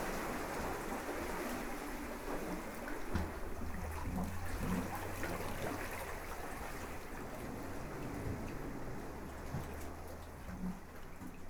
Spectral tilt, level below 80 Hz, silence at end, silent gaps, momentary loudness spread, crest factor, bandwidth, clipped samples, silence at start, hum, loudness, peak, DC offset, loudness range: -5.5 dB/octave; -48 dBFS; 0 s; none; 7 LU; 18 dB; over 20 kHz; under 0.1%; 0 s; none; -43 LUFS; -24 dBFS; under 0.1%; 4 LU